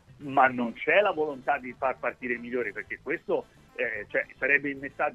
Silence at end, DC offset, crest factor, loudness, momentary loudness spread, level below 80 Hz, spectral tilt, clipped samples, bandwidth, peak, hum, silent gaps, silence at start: 0 s; under 0.1%; 22 dB; -28 LUFS; 10 LU; -64 dBFS; -6.5 dB/octave; under 0.1%; 8.4 kHz; -6 dBFS; none; none; 0.1 s